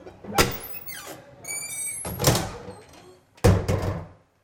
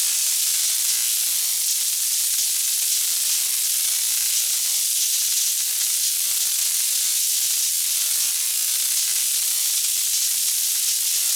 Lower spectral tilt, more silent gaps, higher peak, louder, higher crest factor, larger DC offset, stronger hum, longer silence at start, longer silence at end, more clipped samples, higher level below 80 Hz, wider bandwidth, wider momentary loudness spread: first, -4 dB/octave vs 6 dB/octave; neither; about the same, -4 dBFS vs -6 dBFS; second, -26 LUFS vs -18 LUFS; first, 24 dB vs 16 dB; neither; neither; about the same, 0 s vs 0 s; first, 0.3 s vs 0 s; neither; first, -40 dBFS vs -76 dBFS; second, 17 kHz vs over 20 kHz; first, 19 LU vs 1 LU